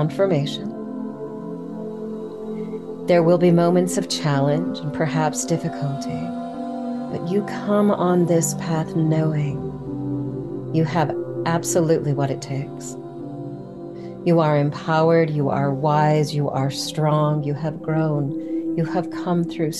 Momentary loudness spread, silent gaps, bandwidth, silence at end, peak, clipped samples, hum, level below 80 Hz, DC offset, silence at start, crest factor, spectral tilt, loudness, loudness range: 14 LU; none; 12.5 kHz; 0 s; -6 dBFS; under 0.1%; none; -56 dBFS; 0.2%; 0 s; 16 dB; -6 dB/octave; -22 LUFS; 4 LU